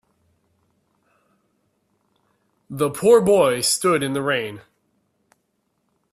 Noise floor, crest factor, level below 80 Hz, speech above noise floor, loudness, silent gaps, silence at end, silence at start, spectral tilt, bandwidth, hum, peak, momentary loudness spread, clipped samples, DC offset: -71 dBFS; 20 dB; -62 dBFS; 53 dB; -18 LUFS; none; 1.55 s; 2.7 s; -4 dB/octave; 15.5 kHz; none; -2 dBFS; 18 LU; under 0.1%; under 0.1%